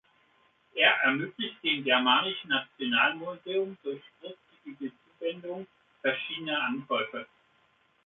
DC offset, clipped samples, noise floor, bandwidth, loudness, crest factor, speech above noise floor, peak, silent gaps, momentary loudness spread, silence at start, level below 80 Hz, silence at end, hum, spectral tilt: under 0.1%; under 0.1%; -68 dBFS; 4.2 kHz; -28 LUFS; 22 dB; 37 dB; -10 dBFS; none; 19 LU; 0.75 s; -80 dBFS; 0.8 s; none; -7 dB/octave